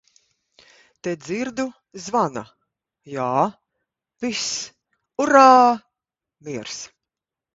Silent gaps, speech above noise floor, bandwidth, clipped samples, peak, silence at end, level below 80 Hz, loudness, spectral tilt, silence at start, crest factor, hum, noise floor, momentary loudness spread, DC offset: none; 67 dB; 8 kHz; under 0.1%; 0 dBFS; 0.7 s; -66 dBFS; -20 LUFS; -3.5 dB/octave; 1.05 s; 22 dB; none; -86 dBFS; 22 LU; under 0.1%